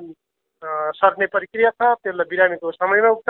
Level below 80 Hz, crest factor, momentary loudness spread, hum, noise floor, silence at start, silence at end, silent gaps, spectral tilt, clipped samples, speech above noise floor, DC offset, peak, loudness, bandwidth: -66 dBFS; 18 dB; 9 LU; none; -59 dBFS; 0 s; 0.1 s; none; -8 dB/octave; under 0.1%; 41 dB; under 0.1%; 0 dBFS; -19 LUFS; 4.2 kHz